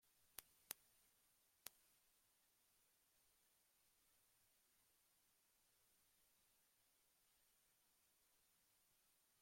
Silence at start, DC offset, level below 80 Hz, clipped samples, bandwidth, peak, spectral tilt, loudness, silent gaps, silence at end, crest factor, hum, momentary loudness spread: 0 s; under 0.1%; under -90 dBFS; under 0.1%; 16.5 kHz; -22 dBFS; 0.5 dB/octave; -60 LUFS; none; 0 s; 50 dB; none; 5 LU